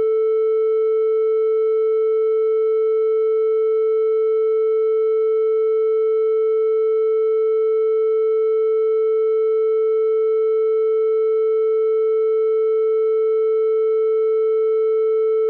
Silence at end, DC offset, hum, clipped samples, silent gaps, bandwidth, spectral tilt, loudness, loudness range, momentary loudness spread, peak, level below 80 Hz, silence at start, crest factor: 0 s; under 0.1%; none; under 0.1%; none; 3.3 kHz; -1.5 dB/octave; -18 LUFS; 0 LU; 0 LU; -14 dBFS; -80 dBFS; 0 s; 4 dB